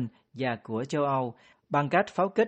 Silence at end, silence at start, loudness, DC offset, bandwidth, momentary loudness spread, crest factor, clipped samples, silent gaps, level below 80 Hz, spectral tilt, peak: 0 s; 0 s; -29 LUFS; under 0.1%; 8.4 kHz; 8 LU; 20 dB; under 0.1%; none; -70 dBFS; -6.5 dB/octave; -10 dBFS